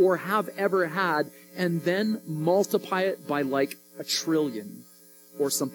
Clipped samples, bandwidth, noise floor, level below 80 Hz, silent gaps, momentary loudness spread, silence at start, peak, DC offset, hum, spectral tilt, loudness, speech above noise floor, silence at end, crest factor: under 0.1%; 18 kHz; -52 dBFS; -84 dBFS; none; 10 LU; 0 s; -10 dBFS; under 0.1%; none; -4.5 dB/octave; -27 LUFS; 26 dB; 0 s; 16 dB